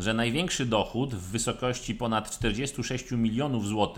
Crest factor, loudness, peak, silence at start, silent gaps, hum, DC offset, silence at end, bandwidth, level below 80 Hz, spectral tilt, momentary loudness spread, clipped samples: 18 dB; -29 LUFS; -10 dBFS; 0 s; none; none; under 0.1%; 0 s; 16.5 kHz; -46 dBFS; -4.5 dB/octave; 5 LU; under 0.1%